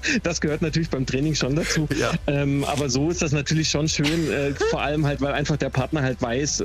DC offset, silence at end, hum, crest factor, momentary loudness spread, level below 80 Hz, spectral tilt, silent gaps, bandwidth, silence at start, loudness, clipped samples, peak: under 0.1%; 0 s; none; 14 dB; 3 LU; -38 dBFS; -4.5 dB/octave; none; 14.5 kHz; 0 s; -23 LUFS; under 0.1%; -8 dBFS